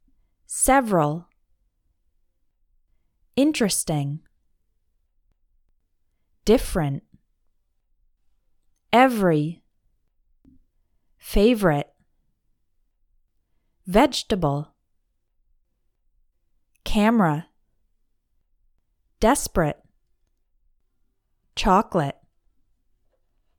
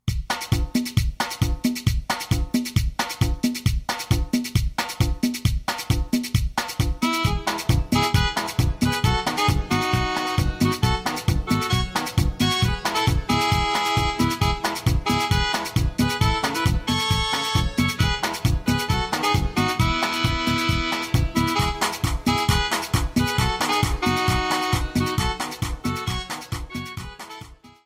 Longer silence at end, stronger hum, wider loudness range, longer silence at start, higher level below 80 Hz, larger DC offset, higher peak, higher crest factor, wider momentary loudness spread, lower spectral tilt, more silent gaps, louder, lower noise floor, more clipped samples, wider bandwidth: first, 1.5 s vs 0.2 s; neither; about the same, 4 LU vs 3 LU; first, 0.5 s vs 0.05 s; second, -40 dBFS vs -30 dBFS; neither; first, -2 dBFS vs -6 dBFS; first, 24 dB vs 16 dB; first, 15 LU vs 5 LU; about the same, -5 dB/octave vs -4.5 dB/octave; neither; about the same, -22 LUFS vs -23 LUFS; first, -70 dBFS vs -43 dBFS; neither; first, 19 kHz vs 16 kHz